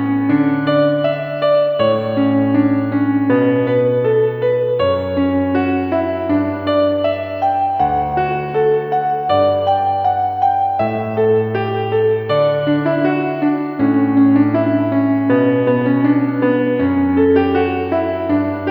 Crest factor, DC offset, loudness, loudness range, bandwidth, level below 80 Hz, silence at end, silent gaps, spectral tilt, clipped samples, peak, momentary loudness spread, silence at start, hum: 14 dB; under 0.1%; -16 LUFS; 2 LU; 4.9 kHz; -48 dBFS; 0 s; none; -10 dB/octave; under 0.1%; -2 dBFS; 4 LU; 0 s; none